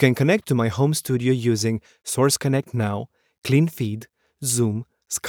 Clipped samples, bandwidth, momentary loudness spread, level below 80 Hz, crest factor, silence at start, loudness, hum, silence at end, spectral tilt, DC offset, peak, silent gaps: under 0.1%; 19 kHz; 11 LU; -60 dBFS; 20 dB; 0 s; -22 LUFS; none; 0 s; -5 dB/octave; under 0.1%; -2 dBFS; 3.38-3.42 s